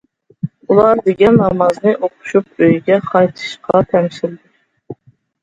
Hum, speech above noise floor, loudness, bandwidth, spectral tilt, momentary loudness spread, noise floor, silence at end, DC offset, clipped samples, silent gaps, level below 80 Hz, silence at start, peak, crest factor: none; 31 dB; -14 LUFS; 9 kHz; -7.5 dB/octave; 14 LU; -43 dBFS; 0.5 s; under 0.1%; under 0.1%; none; -48 dBFS; 0.45 s; 0 dBFS; 14 dB